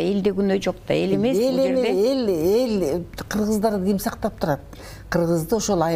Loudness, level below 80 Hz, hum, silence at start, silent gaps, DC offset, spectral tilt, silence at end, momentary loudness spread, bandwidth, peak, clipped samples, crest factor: -22 LUFS; -44 dBFS; none; 0 s; none; under 0.1%; -6 dB/octave; 0 s; 7 LU; 16 kHz; -6 dBFS; under 0.1%; 14 dB